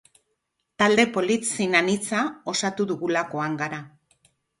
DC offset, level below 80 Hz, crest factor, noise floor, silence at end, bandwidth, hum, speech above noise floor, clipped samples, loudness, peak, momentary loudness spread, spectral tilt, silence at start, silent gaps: under 0.1%; -66 dBFS; 22 dB; -77 dBFS; 0.7 s; 11.5 kHz; none; 53 dB; under 0.1%; -23 LUFS; -4 dBFS; 8 LU; -3.5 dB/octave; 0.8 s; none